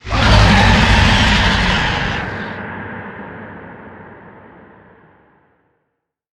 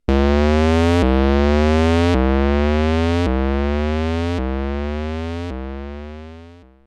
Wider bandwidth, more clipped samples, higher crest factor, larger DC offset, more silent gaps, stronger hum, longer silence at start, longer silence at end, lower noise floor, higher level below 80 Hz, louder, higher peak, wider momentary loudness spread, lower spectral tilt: first, 11.5 kHz vs 9.4 kHz; neither; about the same, 16 dB vs 14 dB; neither; neither; neither; about the same, 0.05 s vs 0.1 s; first, 2.25 s vs 0.35 s; first, -73 dBFS vs -42 dBFS; about the same, -22 dBFS vs -22 dBFS; first, -13 LUFS vs -18 LUFS; first, 0 dBFS vs -4 dBFS; first, 23 LU vs 14 LU; second, -5 dB/octave vs -7.5 dB/octave